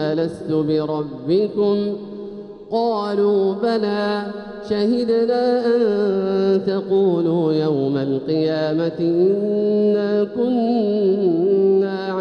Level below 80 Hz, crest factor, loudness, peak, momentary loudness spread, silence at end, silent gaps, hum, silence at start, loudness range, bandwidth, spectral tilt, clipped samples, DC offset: -60 dBFS; 12 dB; -19 LUFS; -8 dBFS; 7 LU; 0 s; none; none; 0 s; 3 LU; 6.4 kHz; -8.5 dB/octave; under 0.1%; under 0.1%